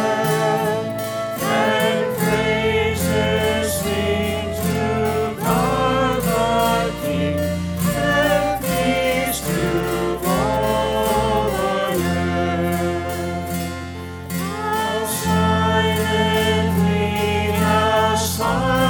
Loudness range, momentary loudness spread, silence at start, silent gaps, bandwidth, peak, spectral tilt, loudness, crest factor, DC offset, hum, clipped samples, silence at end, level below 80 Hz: 3 LU; 6 LU; 0 s; none; 19.5 kHz; -4 dBFS; -5 dB/octave; -19 LUFS; 14 dB; under 0.1%; none; under 0.1%; 0 s; -38 dBFS